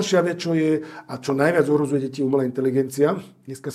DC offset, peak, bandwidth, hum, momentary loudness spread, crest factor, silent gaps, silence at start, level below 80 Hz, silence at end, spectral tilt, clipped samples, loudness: under 0.1%; -4 dBFS; 14.5 kHz; none; 12 LU; 18 dB; none; 0 s; -68 dBFS; 0 s; -6 dB/octave; under 0.1%; -22 LUFS